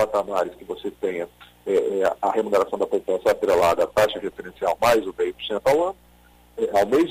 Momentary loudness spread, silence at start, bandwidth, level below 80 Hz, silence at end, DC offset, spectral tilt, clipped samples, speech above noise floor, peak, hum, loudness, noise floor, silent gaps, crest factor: 13 LU; 0 s; 15.5 kHz; -54 dBFS; 0 s; under 0.1%; -4.5 dB/octave; under 0.1%; 31 dB; -8 dBFS; 60 Hz at -60 dBFS; -23 LUFS; -53 dBFS; none; 14 dB